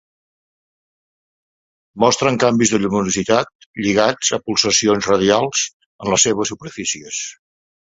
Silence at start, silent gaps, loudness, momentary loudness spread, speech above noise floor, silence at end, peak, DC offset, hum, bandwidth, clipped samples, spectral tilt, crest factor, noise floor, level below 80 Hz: 1.95 s; 3.55-3.59 s, 3.66-3.74 s, 5.73-5.80 s, 5.86-5.99 s; -17 LUFS; 10 LU; over 73 dB; 0.5 s; 0 dBFS; under 0.1%; none; 8.2 kHz; under 0.1%; -3 dB/octave; 18 dB; under -90 dBFS; -52 dBFS